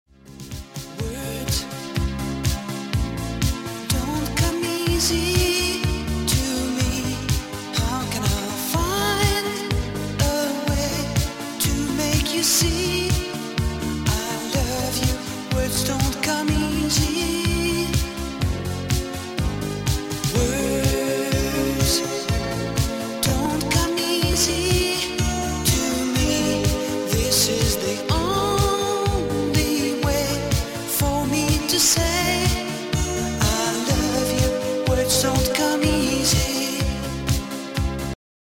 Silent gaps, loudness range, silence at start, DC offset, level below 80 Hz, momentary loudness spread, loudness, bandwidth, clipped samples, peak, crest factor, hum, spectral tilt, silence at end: none; 3 LU; 0.25 s; under 0.1%; -32 dBFS; 7 LU; -22 LUFS; 17 kHz; under 0.1%; -4 dBFS; 18 dB; none; -4 dB/octave; 0.3 s